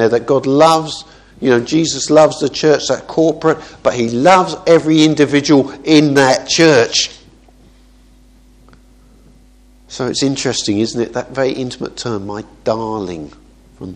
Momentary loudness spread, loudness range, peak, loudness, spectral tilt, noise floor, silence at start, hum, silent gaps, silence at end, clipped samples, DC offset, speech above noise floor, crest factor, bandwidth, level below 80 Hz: 13 LU; 10 LU; 0 dBFS; -13 LUFS; -4.5 dB/octave; -46 dBFS; 0 s; none; none; 0 s; under 0.1%; under 0.1%; 32 dB; 14 dB; 12 kHz; -48 dBFS